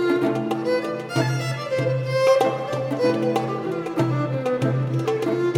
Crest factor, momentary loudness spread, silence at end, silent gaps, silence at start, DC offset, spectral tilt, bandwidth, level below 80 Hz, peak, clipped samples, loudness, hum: 14 dB; 6 LU; 0 s; none; 0 s; under 0.1%; -7 dB/octave; 15.5 kHz; -66 dBFS; -8 dBFS; under 0.1%; -23 LUFS; none